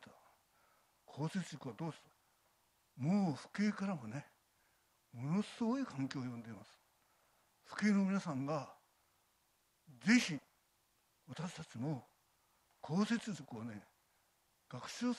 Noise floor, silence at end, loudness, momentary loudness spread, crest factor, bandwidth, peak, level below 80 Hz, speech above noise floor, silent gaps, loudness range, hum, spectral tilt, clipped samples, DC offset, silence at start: -78 dBFS; 0 s; -39 LUFS; 20 LU; 24 dB; 12.5 kHz; -18 dBFS; -82 dBFS; 39 dB; none; 5 LU; none; -5.5 dB/octave; under 0.1%; under 0.1%; 0 s